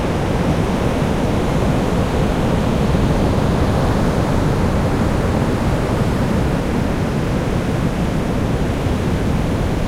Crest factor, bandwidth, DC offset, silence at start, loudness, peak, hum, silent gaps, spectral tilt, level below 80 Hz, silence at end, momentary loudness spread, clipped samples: 12 dB; 16 kHz; under 0.1%; 0 s; -18 LUFS; -4 dBFS; none; none; -7 dB/octave; -24 dBFS; 0 s; 3 LU; under 0.1%